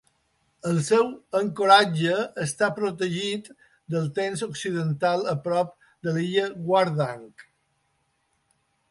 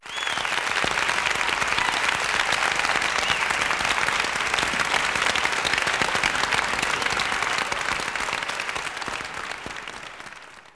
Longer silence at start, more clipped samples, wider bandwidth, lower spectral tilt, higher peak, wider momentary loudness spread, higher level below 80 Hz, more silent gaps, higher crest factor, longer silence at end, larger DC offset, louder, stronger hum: first, 0.65 s vs 0 s; neither; about the same, 11.5 kHz vs 11 kHz; first, -5 dB/octave vs -1 dB/octave; about the same, -4 dBFS vs -6 dBFS; about the same, 12 LU vs 10 LU; second, -68 dBFS vs -50 dBFS; neither; about the same, 22 dB vs 18 dB; first, 1.5 s vs 0.15 s; neither; about the same, -24 LUFS vs -23 LUFS; neither